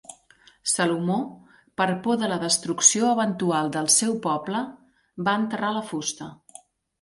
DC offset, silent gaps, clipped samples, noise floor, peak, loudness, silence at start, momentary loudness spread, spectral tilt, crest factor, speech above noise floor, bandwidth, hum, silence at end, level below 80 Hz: under 0.1%; none; under 0.1%; -57 dBFS; -2 dBFS; -23 LUFS; 0.1 s; 13 LU; -3 dB/octave; 22 dB; 33 dB; 12 kHz; none; 0.65 s; -68 dBFS